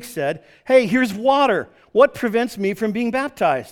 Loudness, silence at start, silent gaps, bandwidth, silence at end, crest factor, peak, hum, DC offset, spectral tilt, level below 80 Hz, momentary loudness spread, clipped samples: -19 LUFS; 0 s; none; 17.5 kHz; 0 s; 18 dB; 0 dBFS; none; under 0.1%; -5.5 dB/octave; -58 dBFS; 9 LU; under 0.1%